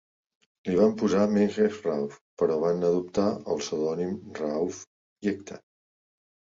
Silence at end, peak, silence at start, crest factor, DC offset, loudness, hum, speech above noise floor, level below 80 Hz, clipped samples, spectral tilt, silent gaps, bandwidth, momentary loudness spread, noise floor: 1 s; -10 dBFS; 0.65 s; 18 dB; under 0.1%; -27 LUFS; none; over 64 dB; -62 dBFS; under 0.1%; -6.5 dB/octave; 2.21-2.37 s, 4.87-5.16 s; 7.6 kHz; 13 LU; under -90 dBFS